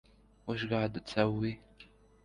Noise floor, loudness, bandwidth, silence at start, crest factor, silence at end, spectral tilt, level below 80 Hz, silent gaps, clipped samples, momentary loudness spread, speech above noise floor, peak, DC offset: -60 dBFS; -34 LUFS; 10.5 kHz; 0.45 s; 22 dB; 0.4 s; -7 dB/octave; -60 dBFS; none; under 0.1%; 13 LU; 27 dB; -14 dBFS; under 0.1%